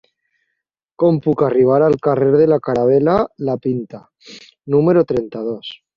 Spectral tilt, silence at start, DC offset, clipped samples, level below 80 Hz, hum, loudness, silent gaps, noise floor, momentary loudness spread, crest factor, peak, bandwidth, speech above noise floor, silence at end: -9 dB/octave; 1 s; under 0.1%; under 0.1%; -52 dBFS; none; -16 LUFS; none; -76 dBFS; 12 LU; 14 dB; -2 dBFS; 7.2 kHz; 61 dB; 0.2 s